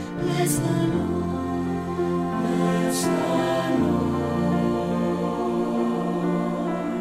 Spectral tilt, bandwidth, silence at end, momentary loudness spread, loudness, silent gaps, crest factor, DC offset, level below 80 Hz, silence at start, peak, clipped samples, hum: -6 dB/octave; 16 kHz; 0 s; 4 LU; -24 LUFS; none; 14 dB; under 0.1%; -48 dBFS; 0 s; -10 dBFS; under 0.1%; none